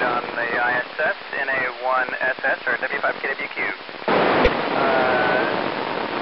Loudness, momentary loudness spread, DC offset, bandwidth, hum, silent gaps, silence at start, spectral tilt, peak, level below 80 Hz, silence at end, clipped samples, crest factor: -21 LUFS; 7 LU; 0.3%; 6 kHz; none; none; 0 s; -7 dB/octave; -4 dBFS; -40 dBFS; 0 s; under 0.1%; 18 dB